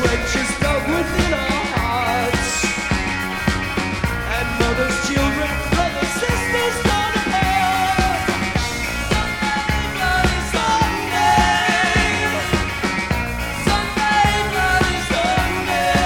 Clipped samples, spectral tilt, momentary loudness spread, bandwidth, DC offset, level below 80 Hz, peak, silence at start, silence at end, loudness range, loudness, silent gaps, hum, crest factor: under 0.1%; -4 dB/octave; 5 LU; 18 kHz; under 0.1%; -28 dBFS; -2 dBFS; 0 s; 0 s; 2 LU; -18 LUFS; none; none; 16 dB